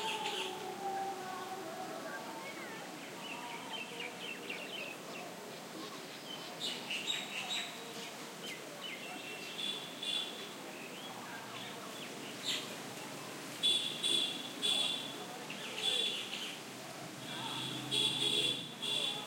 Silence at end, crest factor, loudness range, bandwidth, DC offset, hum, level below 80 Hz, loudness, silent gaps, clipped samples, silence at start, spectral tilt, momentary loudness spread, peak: 0 s; 20 dB; 9 LU; 16.5 kHz; under 0.1%; none; -90 dBFS; -38 LUFS; none; under 0.1%; 0 s; -1.5 dB/octave; 13 LU; -20 dBFS